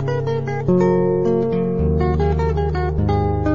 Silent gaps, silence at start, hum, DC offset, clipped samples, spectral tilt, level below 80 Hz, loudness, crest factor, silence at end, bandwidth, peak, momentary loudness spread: none; 0 s; none; 1%; under 0.1%; -9.5 dB/octave; -28 dBFS; -19 LUFS; 12 dB; 0 s; 7.2 kHz; -4 dBFS; 5 LU